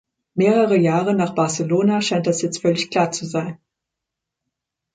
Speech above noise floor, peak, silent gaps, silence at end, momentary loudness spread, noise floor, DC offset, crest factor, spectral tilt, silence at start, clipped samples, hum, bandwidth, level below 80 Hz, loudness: 64 dB; -4 dBFS; none; 1.4 s; 9 LU; -83 dBFS; under 0.1%; 16 dB; -5.5 dB/octave; 0.35 s; under 0.1%; none; 9.6 kHz; -64 dBFS; -19 LUFS